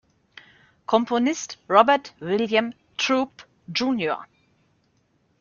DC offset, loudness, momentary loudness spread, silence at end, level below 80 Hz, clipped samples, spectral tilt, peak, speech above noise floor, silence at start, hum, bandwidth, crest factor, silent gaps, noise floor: under 0.1%; -23 LUFS; 14 LU; 1.15 s; -68 dBFS; under 0.1%; -4 dB/octave; -2 dBFS; 44 dB; 0.9 s; none; 7.4 kHz; 22 dB; none; -66 dBFS